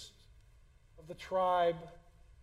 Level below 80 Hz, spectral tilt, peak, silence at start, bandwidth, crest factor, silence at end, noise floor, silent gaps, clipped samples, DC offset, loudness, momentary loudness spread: -62 dBFS; -5 dB/octave; -20 dBFS; 0 s; 13 kHz; 18 dB; 0.5 s; -62 dBFS; none; under 0.1%; under 0.1%; -33 LUFS; 23 LU